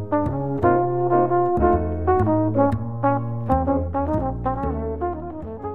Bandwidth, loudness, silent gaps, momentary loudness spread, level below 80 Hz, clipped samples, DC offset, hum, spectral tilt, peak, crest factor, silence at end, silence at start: 4 kHz; -22 LUFS; none; 8 LU; -34 dBFS; under 0.1%; 1%; none; -11.5 dB/octave; -4 dBFS; 16 dB; 0 s; 0 s